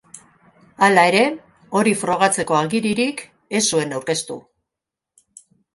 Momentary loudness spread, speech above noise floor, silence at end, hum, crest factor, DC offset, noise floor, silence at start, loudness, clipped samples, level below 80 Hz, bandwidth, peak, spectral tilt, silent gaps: 13 LU; 67 dB; 1.35 s; none; 20 dB; under 0.1%; -85 dBFS; 0.15 s; -18 LUFS; under 0.1%; -62 dBFS; 12 kHz; 0 dBFS; -3.5 dB/octave; none